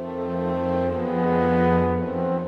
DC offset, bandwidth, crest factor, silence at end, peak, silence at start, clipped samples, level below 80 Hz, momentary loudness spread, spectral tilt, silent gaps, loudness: under 0.1%; 5.2 kHz; 14 dB; 0 s; -8 dBFS; 0 s; under 0.1%; -46 dBFS; 6 LU; -9.5 dB/octave; none; -23 LUFS